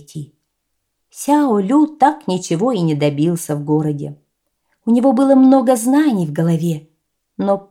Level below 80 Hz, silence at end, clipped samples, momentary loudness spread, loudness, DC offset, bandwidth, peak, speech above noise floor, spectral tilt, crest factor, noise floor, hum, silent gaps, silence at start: -66 dBFS; 0.1 s; under 0.1%; 15 LU; -15 LUFS; under 0.1%; 16 kHz; 0 dBFS; 58 dB; -7 dB/octave; 16 dB; -73 dBFS; none; none; 0.15 s